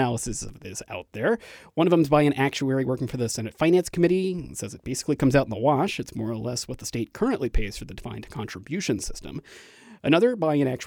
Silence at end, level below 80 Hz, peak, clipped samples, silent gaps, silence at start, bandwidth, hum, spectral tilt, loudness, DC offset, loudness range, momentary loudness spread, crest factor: 0 s; -40 dBFS; -6 dBFS; under 0.1%; none; 0 s; 19 kHz; none; -5.5 dB/octave; -25 LUFS; under 0.1%; 7 LU; 15 LU; 20 dB